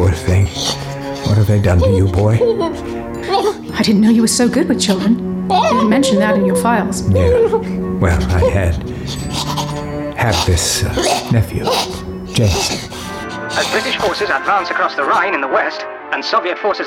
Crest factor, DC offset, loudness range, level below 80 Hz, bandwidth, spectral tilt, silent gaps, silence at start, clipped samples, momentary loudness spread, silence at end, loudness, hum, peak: 14 dB; under 0.1%; 4 LU; -30 dBFS; 16.5 kHz; -5 dB/octave; none; 0 s; under 0.1%; 10 LU; 0 s; -15 LUFS; none; -2 dBFS